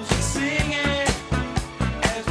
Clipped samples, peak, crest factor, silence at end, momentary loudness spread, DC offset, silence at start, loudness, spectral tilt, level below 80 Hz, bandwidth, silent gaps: under 0.1%; -6 dBFS; 18 dB; 0 s; 5 LU; under 0.1%; 0 s; -23 LUFS; -4 dB/octave; -32 dBFS; 11 kHz; none